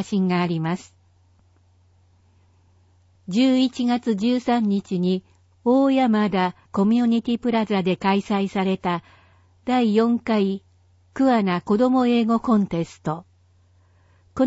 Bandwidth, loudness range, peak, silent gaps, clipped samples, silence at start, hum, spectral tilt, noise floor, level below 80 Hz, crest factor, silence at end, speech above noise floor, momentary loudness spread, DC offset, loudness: 8 kHz; 5 LU; -6 dBFS; none; under 0.1%; 0 s; none; -7 dB/octave; -58 dBFS; -60 dBFS; 16 dB; 0 s; 37 dB; 10 LU; under 0.1%; -21 LUFS